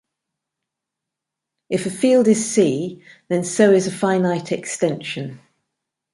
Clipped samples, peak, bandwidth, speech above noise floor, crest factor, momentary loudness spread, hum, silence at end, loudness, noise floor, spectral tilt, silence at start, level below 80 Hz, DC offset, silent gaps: under 0.1%; -2 dBFS; 11.5 kHz; 65 dB; 18 dB; 12 LU; none; 0.8 s; -19 LUFS; -84 dBFS; -5 dB/octave; 1.7 s; -66 dBFS; under 0.1%; none